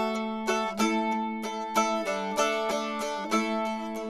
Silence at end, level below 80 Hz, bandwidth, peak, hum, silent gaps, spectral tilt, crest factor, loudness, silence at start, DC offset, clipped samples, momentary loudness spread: 0 s; -64 dBFS; 14 kHz; -12 dBFS; none; none; -3.5 dB/octave; 18 dB; -28 LUFS; 0 s; under 0.1%; under 0.1%; 5 LU